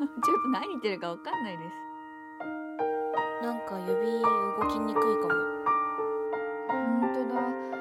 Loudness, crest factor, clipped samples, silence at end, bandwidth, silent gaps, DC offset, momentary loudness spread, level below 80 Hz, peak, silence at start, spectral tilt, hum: -30 LUFS; 16 dB; under 0.1%; 0 s; 14.5 kHz; none; under 0.1%; 12 LU; -66 dBFS; -14 dBFS; 0 s; -6 dB/octave; none